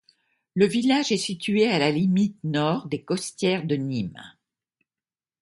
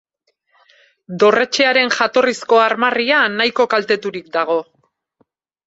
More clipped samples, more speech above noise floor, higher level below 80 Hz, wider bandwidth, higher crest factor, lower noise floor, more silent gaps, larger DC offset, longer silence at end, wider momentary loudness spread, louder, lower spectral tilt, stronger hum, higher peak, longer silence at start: neither; first, over 67 dB vs 50 dB; about the same, -64 dBFS vs -66 dBFS; first, 11.5 kHz vs 8 kHz; about the same, 18 dB vs 16 dB; first, under -90 dBFS vs -66 dBFS; neither; neither; about the same, 1.15 s vs 1.05 s; about the same, 8 LU vs 7 LU; second, -24 LUFS vs -15 LUFS; first, -5.5 dB/octave vs -3 dB/octave; neither; second, -6 dBFS vs -2 dBFS; second, 0.55 s vs 1.1 s